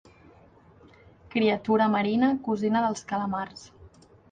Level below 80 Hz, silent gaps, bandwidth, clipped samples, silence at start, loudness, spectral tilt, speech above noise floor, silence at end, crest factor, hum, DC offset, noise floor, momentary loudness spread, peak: -62 dBFS; none; 9.4 kHz; under 0.1%; 1.35 s; -26 LUFS; -6 dB/octave; 30 dB; 0.45 s; 16 dB; none; under 0.1%; -55 dBFS; 10 LU; -12 dBFS